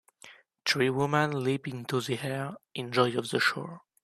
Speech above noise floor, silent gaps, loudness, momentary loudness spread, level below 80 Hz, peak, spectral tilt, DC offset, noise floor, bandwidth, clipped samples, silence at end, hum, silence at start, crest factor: 26 dB; none; -29 LUFS; 11 LU; -72 dBFS; -10 dBFS; -5 dB/octave; under 0.1%; -55 dBFS; 14 kHz; under 0.1%; 0.25 s; none; 0.25 s; 20 dB